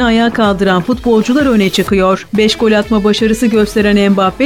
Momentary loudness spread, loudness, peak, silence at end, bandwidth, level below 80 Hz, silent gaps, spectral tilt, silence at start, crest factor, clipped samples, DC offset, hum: 2 LU; -11 LUFS; -2 dBFS; 0 s; 16.5 kHz; -32 dBFS; none; -5.5 dB/octave; 0 s; 10 dB; under 0.1%; 0.5%; none